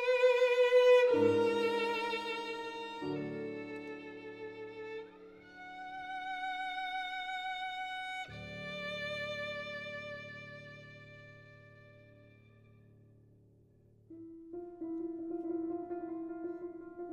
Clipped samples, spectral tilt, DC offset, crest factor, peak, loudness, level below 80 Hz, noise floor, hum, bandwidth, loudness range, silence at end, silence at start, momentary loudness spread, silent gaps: under 0.1%; -5 dB/octave; under 0.1%; 20 dB; -16 dBFS; -35 LUFS; -72 dBFS; -64 dBFS; none; 9.4 kHz; 23 LU; 0 s; 0 s; 23 LU; none